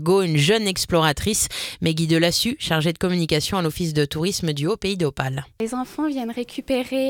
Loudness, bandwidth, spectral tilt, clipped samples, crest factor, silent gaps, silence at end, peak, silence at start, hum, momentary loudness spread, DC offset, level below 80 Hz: -22 LUFS; 18 kHz; -4.5 dB/octave; under 0.1%; 18 dB; none; 0 s; -4 dBFS; 0 s; none; 9 LU; under 0.1%; -46 dBFS